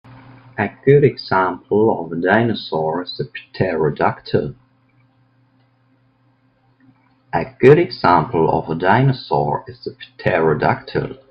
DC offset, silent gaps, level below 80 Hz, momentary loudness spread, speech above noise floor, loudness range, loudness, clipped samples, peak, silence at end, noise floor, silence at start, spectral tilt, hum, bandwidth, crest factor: under 0.1%; none; -50 dBFS; 12 LU; 42 dB; 9 LU; -17 LUFS; under 0.1%; 0 dBFS; 0.15 s; -59 dBFS; 0.1 s; -9 dB/octave; none; 5.6 kHz; 18 dB